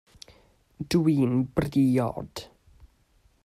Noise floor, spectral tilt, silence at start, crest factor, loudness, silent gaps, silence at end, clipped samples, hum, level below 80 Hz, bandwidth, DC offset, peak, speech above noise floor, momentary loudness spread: -64 dBFS; -7.5 dB/octave; 0.8 s; 18 dB; -25 LUFS; none; 1 s; under 0.1%; none; -52 dBFS; 15 kHz; under 0.1%; -10 dBFS; 39 dB; 17 LU